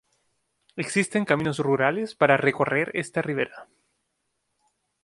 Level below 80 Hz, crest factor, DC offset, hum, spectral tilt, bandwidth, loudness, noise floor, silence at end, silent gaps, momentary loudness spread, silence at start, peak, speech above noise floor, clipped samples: -66 dBFS; 22 dB; under 0.1%; none; -5.5 dB/octave; 11.5 kHz; -24 LUFS; -76 dBFS; 1.4 s; none; 9 LU; 0.75 s; -4 dBFS; 52 dB; under 0.1%